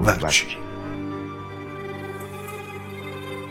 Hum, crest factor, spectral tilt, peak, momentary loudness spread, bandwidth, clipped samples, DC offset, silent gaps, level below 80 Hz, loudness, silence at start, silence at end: none; 24 dB; -3.5 dB/octave; -4 dBFS; 15 LU; 16.5 kHz; under 0.1%; under 0.1%; none; -44 dBFS; -27 LUFS; 0 s; 0 s